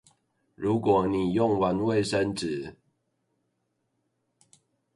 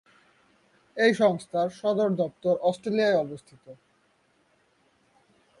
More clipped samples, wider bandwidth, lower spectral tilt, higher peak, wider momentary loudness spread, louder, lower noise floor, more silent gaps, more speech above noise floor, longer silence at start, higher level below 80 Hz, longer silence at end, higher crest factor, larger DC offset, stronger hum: neither; about the same, 11.5 kHz vs 11.5 kHz; about the same, -6.5 dB/octave vs -6 dB/octave; about the same, -10 dBFS vs -8 dBFS; about the same, 9 LU vs 9 LU; about the same, -26 LUFS vs -25 LUFS; first, -77 dBFS vs -67 dBFS; neither; first, 52 dB vs 42 dB; second, 0.6 s vs 0.95 s; first, -56 dBFS vs -72 dBFS; first, 2.25 s vs 1.85 s; about the same, 18 dB vs 20 dB; neither; neither